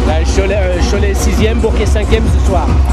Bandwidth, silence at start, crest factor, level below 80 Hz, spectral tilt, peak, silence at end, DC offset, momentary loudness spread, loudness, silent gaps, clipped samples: 13 kHz; 0 s; 10 dB; -14 dBFS; -6 dB/octave; 0 dBFS; 0 s; under 0.1%; 1 LU; -13 LUFS; none; under 0.1%